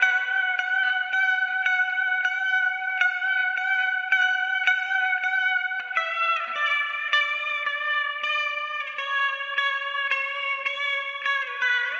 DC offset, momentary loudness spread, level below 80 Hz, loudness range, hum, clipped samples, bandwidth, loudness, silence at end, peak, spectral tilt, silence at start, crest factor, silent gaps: under 0.1%; 4 LU; under -90 dBFS; 3 LU; none; under 0.1%; 7.6 kHz; -23 LUFS; 0 s; -6 dBFS; 2.5 dB/octave; 0 s; 18 dB; none